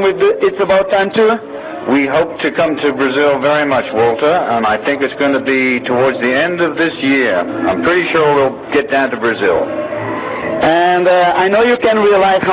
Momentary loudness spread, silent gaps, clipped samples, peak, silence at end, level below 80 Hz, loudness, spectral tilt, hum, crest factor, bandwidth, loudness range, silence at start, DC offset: 6 LU; none; under 0.1%; 0 dBFS; 0 s; -48 dBFS; -13 LUFS; -9 dB/octave; none; 12 dB; 4 kHz; 1 LU; 0 s; under 0.1%